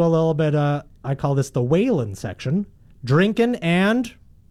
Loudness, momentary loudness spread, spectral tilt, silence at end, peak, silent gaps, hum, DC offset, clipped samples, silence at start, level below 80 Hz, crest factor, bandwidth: -21 LUFS; 11 LU; -7 dB/octave; 0.4 s; -8 dBFS; none; none; under 0.1%; under 0.1%; 0 s; -50 dBFS; 14 dB; 13 kHz